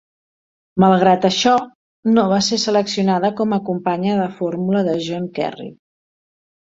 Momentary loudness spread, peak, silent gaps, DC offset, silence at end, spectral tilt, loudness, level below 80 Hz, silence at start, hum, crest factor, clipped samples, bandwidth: 11 LU; -2 dBFS; 1.75-2.03 s; under 0.1%; 0.9 s; -5.5 dB/octave; -18 LUFS; -58 dBFS; 0.75 s; none; 18 dB; under 0.1%; 7.8 kHz